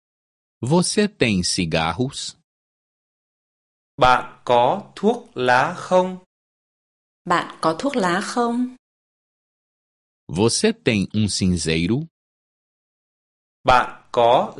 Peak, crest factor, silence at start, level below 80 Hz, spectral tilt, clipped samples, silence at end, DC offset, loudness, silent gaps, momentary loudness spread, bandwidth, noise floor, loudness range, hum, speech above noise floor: -2 dBFS; 20 dB; 0.6 s; -46 dBFS; -4.5 dB/octave; under 0.1%; 0 s; under 0.1%; -20 LUFS; 2.44-3.98 s, 6.26-7.25 s, 8.79-10.27 s, 12.11-13.64 s; 9 LU; 11.5 kHz; under -90 dBFS; 4 LU; none; over 71 dB